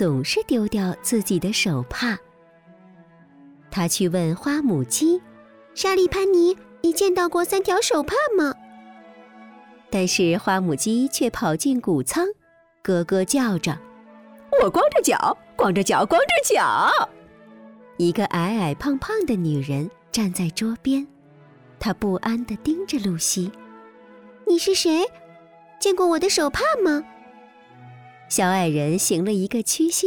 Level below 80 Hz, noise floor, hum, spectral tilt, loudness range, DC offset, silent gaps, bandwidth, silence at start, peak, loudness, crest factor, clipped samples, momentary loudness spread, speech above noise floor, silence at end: -50 dBFS; -52 dBFS; none; -4 dB/octave; 5 LU; under 0.1%; none; 19.5 kHz; 0 s; -8 dBFS; -21 LUFS; 14 dB; under 0.1%; 8 LU; 31 dB; 0 s